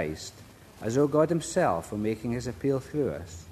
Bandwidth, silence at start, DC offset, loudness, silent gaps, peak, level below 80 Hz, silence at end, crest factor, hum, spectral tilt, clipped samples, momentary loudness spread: 13.5 kHz; 0 s; under 0.1%; -28 LUFS; none; -10 dBFS; -54 dBFS; 0 s; 18 dB; none; -6 dB/octave; under 0.1%; 13 LU